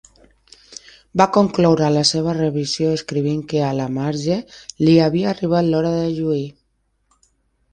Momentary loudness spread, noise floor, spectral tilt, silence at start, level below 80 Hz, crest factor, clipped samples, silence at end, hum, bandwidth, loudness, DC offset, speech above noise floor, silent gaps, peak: 10 LU; -67 dBFS; -6 dB/octave; 0.7 s; -52 dBFS; 18 dB; under 0.1%; 1.2 s; none; 10 kHz; -18 LUFS; under 0.1%; 49 dB; none; 0 dBFS